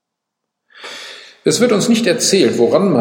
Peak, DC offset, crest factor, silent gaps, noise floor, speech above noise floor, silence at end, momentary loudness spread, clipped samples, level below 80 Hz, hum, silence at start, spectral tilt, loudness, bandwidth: 0 dBFS; under 0.1%; 16 dB; none; -78 dBFS; 65 dB; 0 s; 19 LU; under 0.1%; -62 dBFS; none; 0.8 s; -4 dB/octave; -13 LUFS; 16.5 kHz